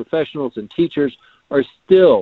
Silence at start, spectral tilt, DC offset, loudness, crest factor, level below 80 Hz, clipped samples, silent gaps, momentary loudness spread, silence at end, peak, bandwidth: 0 s; -9 dB/octave; under 0.1%; -18 LUFS; 16 dB; -54 dBFS; under 0.1%; none; 11 LU; 0 s; 0 dBFS; 4.4 kHz